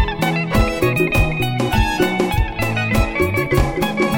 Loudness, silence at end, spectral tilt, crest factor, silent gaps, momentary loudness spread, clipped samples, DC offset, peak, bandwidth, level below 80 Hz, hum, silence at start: -18 LUFS; 0 s; -6 dB/octave; 16 dB; none; 3 LU; under 0.1%; under 0.1%; -2 dBFS; 17 kHz; -24 dBFS; none; 0 s